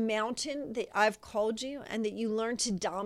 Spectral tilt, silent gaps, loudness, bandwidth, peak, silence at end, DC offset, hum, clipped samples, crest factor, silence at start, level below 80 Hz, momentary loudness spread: -3.5 dB/octave; none; -32 LUFS; 13.5 kHz; -12 dBFS; 0 s; under 0.1%; none; under 0.1%; 20 dB; 0 s; -66 dBFS; 7 LU